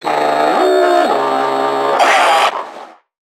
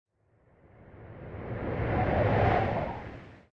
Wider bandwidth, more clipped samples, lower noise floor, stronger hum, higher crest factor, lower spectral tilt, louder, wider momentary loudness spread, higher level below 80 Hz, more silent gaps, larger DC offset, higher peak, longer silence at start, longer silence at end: first, 17 kHz vs 6 kHz; neither; second, -35 dBFS vs -66 dBFS; neither; about the same, 14 dB vs 18 dB; second, -2.5 dB/octave vs -9 dB/octave; first, -12 LUFS vs -29 LUFS; second, 6 LU vs 21 LU; second, -76 dBFS vs -44 dBFS; neither; neither; first, 0 dBFS vs -14 dBFS; second, 0 s vs 0.8 s; first, 0.5 s vs 0.15 s